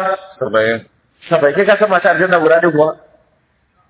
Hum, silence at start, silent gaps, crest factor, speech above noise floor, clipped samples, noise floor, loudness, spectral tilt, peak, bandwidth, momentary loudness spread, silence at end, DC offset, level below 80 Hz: none; 0 s; none; 14 dB; 46 dB; under 0.1%; -59 dBFS; -13 LUFS; -9.5 dB/octave; 0 dBFS; 4 kHz; 9 LU; 0.95 s; under 0.1%; -58 dBFS